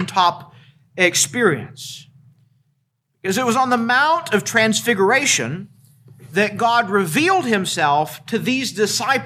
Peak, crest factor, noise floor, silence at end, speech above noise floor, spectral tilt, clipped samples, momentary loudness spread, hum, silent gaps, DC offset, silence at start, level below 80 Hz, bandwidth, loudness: -2 dBFS; 18 dB; -69 dBFS; 0 s; 51 dB; -3 dB/octave; under 0.1%; 13 LU; none; none; under 0.1%; 0 s; -66 dBFS; 16 kHz; -17 LUFS